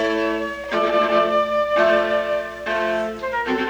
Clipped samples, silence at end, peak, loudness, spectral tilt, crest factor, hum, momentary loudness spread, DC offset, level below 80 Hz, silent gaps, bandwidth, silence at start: under 0.1%; 0 s; -6 dBFS; -20 LUFS; -4.5 dB/octave; 14 dB; none; 8 LU; under 0.1%; -50 dBFS; none; over 20 kHz; 0 s